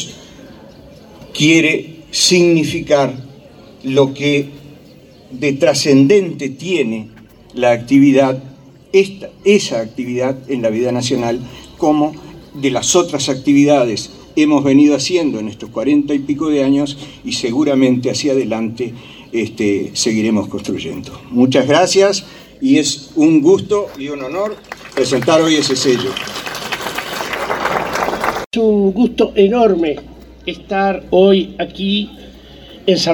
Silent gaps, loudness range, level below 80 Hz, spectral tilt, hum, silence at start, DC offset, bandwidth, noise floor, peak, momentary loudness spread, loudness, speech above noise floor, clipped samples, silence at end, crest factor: 28.46-28.51 s; 4 LU; -48 dBFS; -4.5 dB/octave; none; 0 s; under 0.1%; 19 kHz; -41 dBFS; 0 dBFS; 13 LU; -15 LUFS; 28 dB; under 0.1%; 0 s; 14 dB